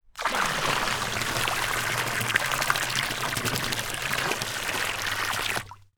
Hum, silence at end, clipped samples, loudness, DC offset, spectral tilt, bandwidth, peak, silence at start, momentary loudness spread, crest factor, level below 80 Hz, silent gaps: none; 0.2 s; under 0.1%; -26 LUFS; under 0.1%; -2 dB/octave; over 20 kHz; -2 dBFS; 0.15 s; 3 LU; 26 dB; -48 dBFS; none